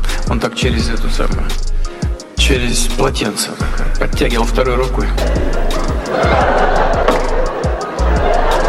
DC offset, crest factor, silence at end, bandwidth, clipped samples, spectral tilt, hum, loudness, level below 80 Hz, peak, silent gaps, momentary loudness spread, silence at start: under 0.1%; 12 dB; 0 s; 13.5 kHz; under 0.1%; -4.5 dB/octave; none; -16 LUFS; -16 dBFS; 0 dBFS; none; 8 LU; 0 s